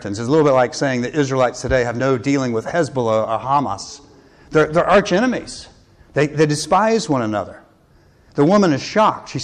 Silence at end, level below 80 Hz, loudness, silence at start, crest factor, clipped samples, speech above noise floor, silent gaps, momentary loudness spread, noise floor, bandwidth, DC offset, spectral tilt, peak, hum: 0 s; -44 dBFS; -17 LUFS; 0 s; 12 dB; under 0.1%; 35 dB; none; 11 LU; -52 dBFS; 11 kHz; under 0.1%; -5.5 dB/octave; -6 dBFS; none